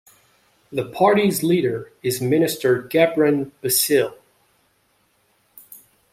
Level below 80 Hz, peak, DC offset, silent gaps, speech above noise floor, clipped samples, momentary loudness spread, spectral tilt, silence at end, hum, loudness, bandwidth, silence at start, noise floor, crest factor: -64 dBFS; -4 dBFS; under 0.1%; none; 45 dB; under 0.1%; 11 LU; -4.5 dB/octave; 0.35 s; none; -20 LUFS; 16 kHz; 0.7 s; -64 dBFS; 18 dB